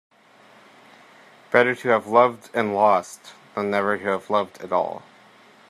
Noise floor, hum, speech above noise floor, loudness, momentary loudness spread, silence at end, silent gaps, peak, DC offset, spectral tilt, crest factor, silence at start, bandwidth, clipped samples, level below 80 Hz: -52 dBFS; none; 31 dB; -21 LUFS; 13 LU; 0.7 s; none; -2 dBFS; under 0.1%; -5 dB/octave; 22 dB; 1.5 s; 13.5 kHz; under 0.1%; -74 dBFS